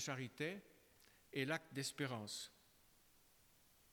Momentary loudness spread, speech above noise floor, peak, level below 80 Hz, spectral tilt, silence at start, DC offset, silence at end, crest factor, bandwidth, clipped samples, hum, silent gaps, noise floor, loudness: 7 LU; 26 dB; -26 dBFS; -82 dBFS; -4 dB/octave; 0 s; under 0.1%; 1.4 s; 22 dB; over 20 kHz; under 0.1%; none; none; -72 dBFS; -46 LUFS